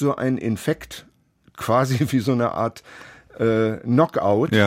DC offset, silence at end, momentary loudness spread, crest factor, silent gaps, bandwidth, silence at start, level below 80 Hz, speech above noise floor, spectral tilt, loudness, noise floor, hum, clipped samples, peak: under 0.1%; 0 s; 19 LU; 20 dB; none; 16.5 kHz; 0 s; -56 dBFS; 32 dB; -6.5 dB/octave; -21 LUFS; -53 dBFS; none; under 0.1%; -2 dBFS